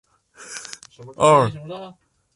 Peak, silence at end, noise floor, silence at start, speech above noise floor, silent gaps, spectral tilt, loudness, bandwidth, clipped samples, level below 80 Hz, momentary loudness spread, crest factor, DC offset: -2 dBFS; 0.5 s; -43 dBFS; 0.5 s; 24 dB; none; -5 dB/octave; -17 LUFS; 11.5 kHz; under 0.1%; -58 dBFS; 25 LU; 20 dB; under 0.1%